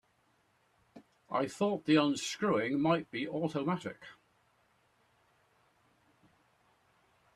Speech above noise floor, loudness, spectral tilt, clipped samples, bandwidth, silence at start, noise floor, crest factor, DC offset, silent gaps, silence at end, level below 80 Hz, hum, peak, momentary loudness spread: 41 dB; -33 LUFS; -5.5 dB/octave; under 0.1%; 12.5 kHz; 0.95 s; -73 dBFS; 22 dB; under 0.1%; none; 3.25 s; -76 dBFS; none; -14 dBFS; 10 LU